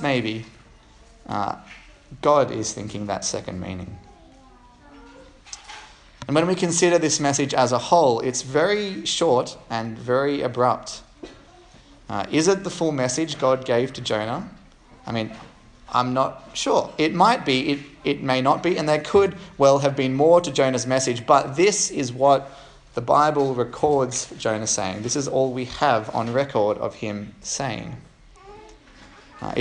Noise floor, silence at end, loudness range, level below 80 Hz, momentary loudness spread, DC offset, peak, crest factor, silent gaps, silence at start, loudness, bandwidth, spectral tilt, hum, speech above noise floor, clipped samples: -50 dBFS; 0 s; 7 LU; -54 dBFS; 14 LU; under 0.1%; -2 dBFS; 22 dB; none; 0 s; -22 LUFS; 11 kHz; -4 dB/octave; none; 28 dB; under 0.1%